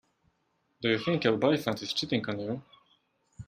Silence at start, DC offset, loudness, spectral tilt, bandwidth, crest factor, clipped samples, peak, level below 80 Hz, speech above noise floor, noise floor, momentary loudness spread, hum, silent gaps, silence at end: 0.8 s; under 0.1%; -29 LUFS; -5.5 dB/octave; 15.5 kHz; 20 dB; under 0.1%; -10 dBFS; -66 dBFS; 46 dB; -75 dBFS; 10 LU; none; none; 0.05 s